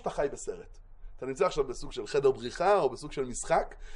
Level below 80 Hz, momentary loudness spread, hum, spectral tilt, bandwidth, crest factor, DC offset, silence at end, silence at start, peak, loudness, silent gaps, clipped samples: -48 dBFS; 14 LU; none; -4 dB/octave; 11 kHz; 16 dB; under 0.1%; 0 s; 0 s; -14 dBFS; -30 LUFS; none; under 0.1%